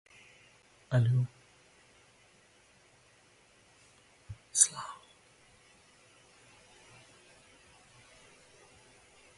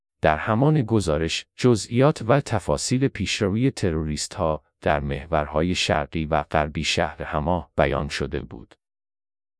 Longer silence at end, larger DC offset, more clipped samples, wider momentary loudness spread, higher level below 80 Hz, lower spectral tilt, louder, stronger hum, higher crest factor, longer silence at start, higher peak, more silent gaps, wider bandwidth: first, 4.45 s vs 0.95 s; neither; neither; first, 31 LU vs 6 LU; second, -70 dBFS vs -40 dBFS; second, -3.5 dB/octave vs -5.5 dB/octave; second, -29 LUFS vs -23 LUFS; neither; first, 30 dB vs 20 dB; first, 0.9 s vs 0.25 s; second, -8 dBFS vs -4 dBFS; neither; about the same, 11.5 kHz vs 11 kHz